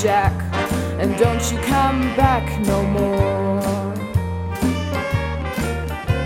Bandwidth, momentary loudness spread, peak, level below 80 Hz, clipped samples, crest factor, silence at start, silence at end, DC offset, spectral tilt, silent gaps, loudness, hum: 16.5 kHz; 6 LU; -2 dBFS; -30 dBFS; under 0.1%; 18 dB; 0 s; 0 s; under 0.1%; -6 dB/octave; none; -20 LUFS; none